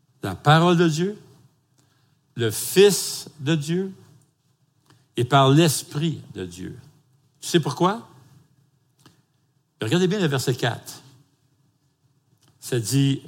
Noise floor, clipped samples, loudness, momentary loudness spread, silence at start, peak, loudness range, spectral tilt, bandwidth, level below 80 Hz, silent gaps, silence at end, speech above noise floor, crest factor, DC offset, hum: -67 dBFS; under 0.1%; -21 LUFS; 19 LU; 0.25 s; -2 dBFS; 7 LU; -5 dB/octave; 17 kHz; -68 dBFS; none; 0 s; 46 dB; 22 dB; under 0.1%; none